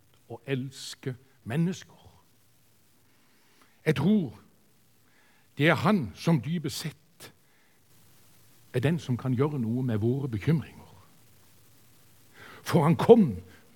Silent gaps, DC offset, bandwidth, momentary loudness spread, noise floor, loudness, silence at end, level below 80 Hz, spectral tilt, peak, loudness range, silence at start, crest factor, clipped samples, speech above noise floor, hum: none; under 0.1%; 18 kHz; 19 LU; -65 dBFS; -27 LUFS; 0.3 s; -68 dBFS; -7 dB/octave; -4 dBFS; 7 LU; 0.3 s; 26 dB; under 0.1%; 39 dB; none